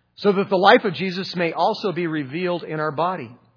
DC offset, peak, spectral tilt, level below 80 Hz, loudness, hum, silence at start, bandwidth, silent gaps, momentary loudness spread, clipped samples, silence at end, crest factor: under 0.1%; 0 dBFS; -6.5 dB/octave; -72 dBFS; -21 LUFS; none; 0.2 s; 5.4 kHz; none; 10 LU; under 0.1%; 0.2 s; 22 dB